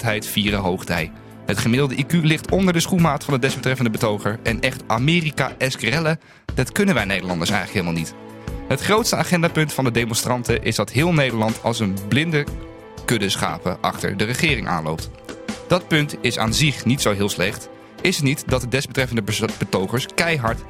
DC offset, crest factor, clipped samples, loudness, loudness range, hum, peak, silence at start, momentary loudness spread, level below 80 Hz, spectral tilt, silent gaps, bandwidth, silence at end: under 0.1%; 20 dB; under 0.1%; -20 LUFS; 2 LU; none; -2 dBFS; 0 s; 9 LU; -40 dBFS; -4.5 dB/octave; none; 16.5 kHz; 0 s